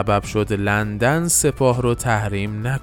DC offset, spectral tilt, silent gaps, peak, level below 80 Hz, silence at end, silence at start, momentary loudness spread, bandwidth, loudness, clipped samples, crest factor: under 0.1%; -4.5 dB/octave; none; -4 dBFS; -38 dBFS; 0 s; 0 s; 7 LU; 18 kHz; -19 LUFS; under 0.1%; 14 dB